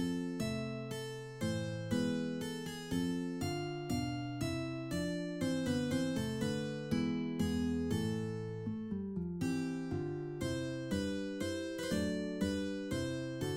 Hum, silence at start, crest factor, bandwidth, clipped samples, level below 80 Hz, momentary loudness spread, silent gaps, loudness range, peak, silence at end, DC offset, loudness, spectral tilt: none; 0 s; 14 dB; 16.5 kHz; under 0.1%; -60 dBFS; 5 LU; none; 2 LU; -22 dBFS; 0 s; under 0.1%; -38 LUFS; -6 dB/octave